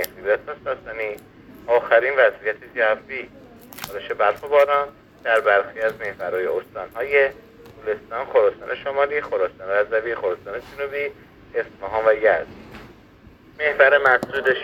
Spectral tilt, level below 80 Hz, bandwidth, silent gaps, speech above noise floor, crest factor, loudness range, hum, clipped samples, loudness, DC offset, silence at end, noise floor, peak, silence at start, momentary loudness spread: -4 dB/octave; -56 dBFS; 18 kHz; none; 27 dB; 20 dB; 4 LU; none; under 0.1%; -21 LUFS; under 0.1%; 0 s; -48 dBFS; -2 dBFS; 0 s; 15 LU